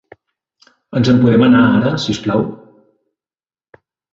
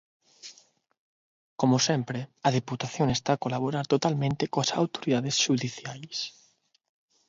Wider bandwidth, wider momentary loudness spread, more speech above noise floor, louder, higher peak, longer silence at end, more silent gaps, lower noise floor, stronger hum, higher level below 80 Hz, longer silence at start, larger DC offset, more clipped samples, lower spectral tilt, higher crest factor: about the same, 7.6 kHz vs 7.8 kHz; second, 10 LU vs 14 LU; first, over 78 dB vs 39 dB; first, -13 LUFS vs -27 LUFS; first, 0 dBFS vs -8 dBFS; first, 1.6 s vs 1 s; second, none vs 0.98-1.57 s; first, under -90 dBFS vs -66 dBFS; neither; first, -46 dBFS vs -62 dBFS; first, 0.9 s vs 0.45 s; neither; neither; first, -7 dB/octave vs -4.5 dB/octave; second, 16 dB vs 22 dB